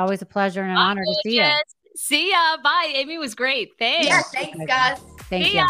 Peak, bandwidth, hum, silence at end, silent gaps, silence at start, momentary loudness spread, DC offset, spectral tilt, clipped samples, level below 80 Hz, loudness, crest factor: -4 dBFS; 15.5 kHz; none; 0 s; none; 0 s; 10 LU; under 0.1%; -3 dB/octave; under 0.1%; -54 dBFS; -20 LUFS; 18 dB